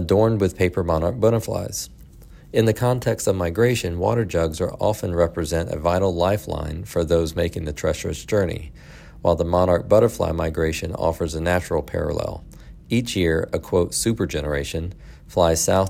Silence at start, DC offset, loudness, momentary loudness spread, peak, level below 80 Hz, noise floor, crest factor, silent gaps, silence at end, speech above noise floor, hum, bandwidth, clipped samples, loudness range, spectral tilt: 0 s; under 0.1%; -22 LUFS; 8 LU; -4 dBFS; -40 dBFS; -44 dBFS; 18 dB; none; 0 s; 23 dB; none; 16.5 kHz; under 0.1%; 2 LU; -5.5 dB/octave